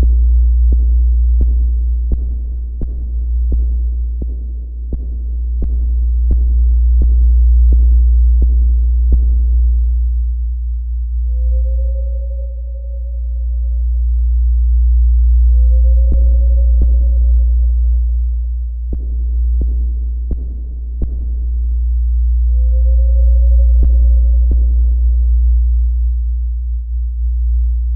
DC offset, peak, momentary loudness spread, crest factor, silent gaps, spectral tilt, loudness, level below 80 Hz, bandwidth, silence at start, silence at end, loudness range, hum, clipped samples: under 0.1%; -2 dBFS; 10 LU; 10 dB; none; -15 dB/octave; -16 LUFS; -12 dBFS; 0.6 kHz; 0 s; 0 s; 7 LU; none; under 0.1%